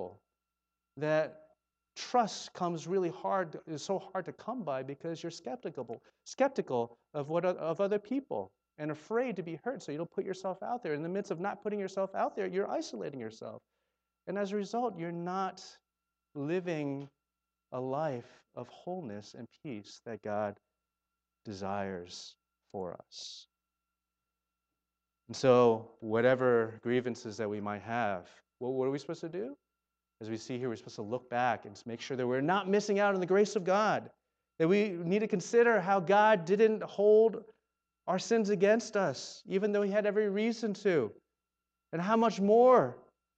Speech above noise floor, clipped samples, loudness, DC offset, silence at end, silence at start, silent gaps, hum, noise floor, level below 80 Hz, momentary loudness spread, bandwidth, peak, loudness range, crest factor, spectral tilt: 57 dB; under 0.1%; -32 LUFS; under 0.1%; 0.35 s; 0 s; none; none; -89 dBFS; -82 dBFS; 18 LU; 8.6 kHz; -12 dBFS; 13 LU; 20 dB; -5.5 dB/octave